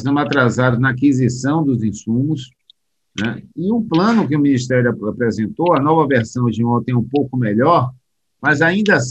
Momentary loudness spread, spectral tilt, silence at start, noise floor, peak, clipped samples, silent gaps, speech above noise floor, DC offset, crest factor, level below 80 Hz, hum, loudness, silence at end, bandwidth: 8 LU; -6.5 dB/octave; 0 s; -56 dBFS; -2 dBFS; under 0.1%; none; 40 dB; under 0.1%; 16 dB; -52 dBFS; none; -17 LUFS; 0 s; 8.4 kHz